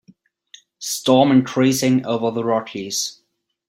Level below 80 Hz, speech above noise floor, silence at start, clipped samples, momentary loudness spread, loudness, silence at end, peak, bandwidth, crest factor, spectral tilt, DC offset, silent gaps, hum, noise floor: -60 dBFS; 36 dB; 0.8 s; under 0.1%; 11 LU; -18 LUFS; 0.55 s; -2 dBFS; 16.5 kHz; 18 dB; -4.5 dB/octave; under 0.1%; none; none; -54 dBFS